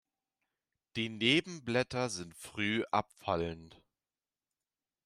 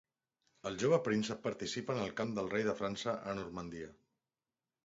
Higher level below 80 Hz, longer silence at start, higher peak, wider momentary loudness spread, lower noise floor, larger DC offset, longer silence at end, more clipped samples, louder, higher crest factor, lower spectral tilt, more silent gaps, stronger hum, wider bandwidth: about the same, -68 dBFS vs -68 dBFS; first, 0.95 s vs 0.65 s; first, -12 dBFS vs -18 dBFS; about the same, 13 LU vs 13 LU; about the same, under -90 dBFS vs under -90 dBFS; neither; first, 1.35 s vs 0.95 s; neither; first, -34 LUFS vs -37 LUFS; about the same, 24 dB vs 20 dB; about the same, -4.5 dB/octave vs -4.5 dB/octave; neither; neither; first, 14.5 kHz vs 7.6 kHz